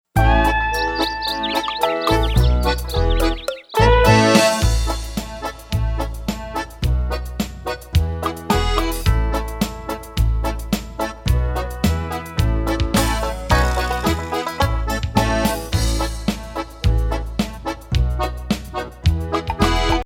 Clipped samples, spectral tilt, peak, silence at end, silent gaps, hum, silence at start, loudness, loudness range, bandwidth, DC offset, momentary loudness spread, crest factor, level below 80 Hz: under 0.1%; -5 dB/octave; 0 dBFS; 0 s; none; none; 0.15 s; -20 LUFS; 6 LU; 17 kHz; under 0.1%; 10 LU; 18 dB; -22 dBFS